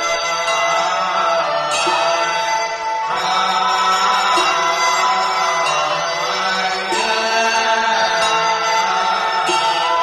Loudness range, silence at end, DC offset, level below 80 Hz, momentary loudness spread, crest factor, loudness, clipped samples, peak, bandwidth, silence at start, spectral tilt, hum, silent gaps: 1 LU; 0 s; under 0.1%; -56 dBFS; 4 LU; 12 dB; -16 LUFS; under 0.1%; -4 dBFS; 13.5 kHz; 0 s; -0.5 dB/octave; none; none